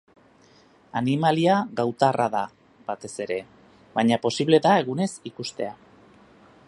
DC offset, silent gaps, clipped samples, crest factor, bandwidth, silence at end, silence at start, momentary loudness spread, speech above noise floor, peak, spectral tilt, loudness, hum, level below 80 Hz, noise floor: under 0.1%; none; under 0.1%; 22 dB; 11.5 kHz; 0.95 s; 0.95 s; 14 LU; 33 dB; -4 dBFS; -5.5 dB/octave; -24 LUFS; none; -68 dBFS; -56 dBFS